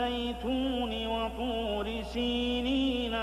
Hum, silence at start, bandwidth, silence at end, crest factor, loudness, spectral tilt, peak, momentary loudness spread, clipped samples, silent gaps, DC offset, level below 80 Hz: none; 0 s; 14 kHz; 0 s; 12 dB; -31 LUFS; -5.5 dB/octave; -18 dBFS; 4 LU; under 0.1%; none; under 0.1%; -44 dBFS